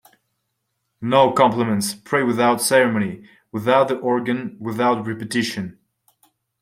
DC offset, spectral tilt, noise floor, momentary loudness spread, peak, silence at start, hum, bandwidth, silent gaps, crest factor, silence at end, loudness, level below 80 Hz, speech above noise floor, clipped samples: under 0.1%; -4.5 dB/octave; -75 dBFS; 13 LU; -2 dBFS; 1 s; none; 16 kHz; none; 18 dB; 0.9 s; -19 LUFS; -62 dBFS; 56 dB; under 0.1%